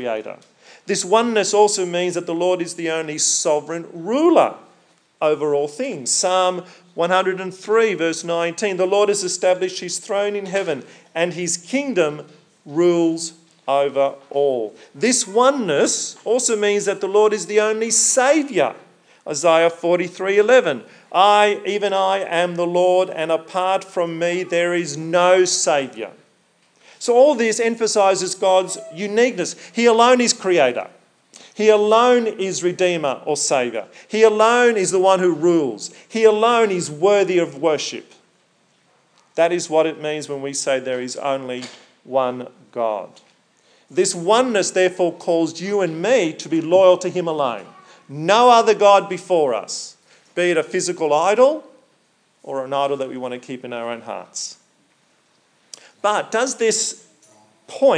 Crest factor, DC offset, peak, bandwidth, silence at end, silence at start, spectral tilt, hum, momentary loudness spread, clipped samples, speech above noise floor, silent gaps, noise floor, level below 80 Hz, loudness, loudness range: 18 dB; under 0.1%; 0 dBFS; 10.5 kHz; 0 s; 0 s; -3 dB/octave; none; 14 LU; under 0.1%; 43 dB; none; -61 dBFS; -90 dBFS; -18 LUFS; 6 LU